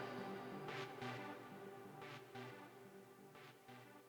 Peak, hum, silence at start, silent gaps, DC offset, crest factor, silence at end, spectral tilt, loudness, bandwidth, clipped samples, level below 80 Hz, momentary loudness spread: -34 dBFS; none; 0 s; none; under 0.1%; 18 dB; 0 s; -5.5 dB/octave; -53 LUFS; over 20 kHz; under 0.1%; -88 dBFS; 12 LU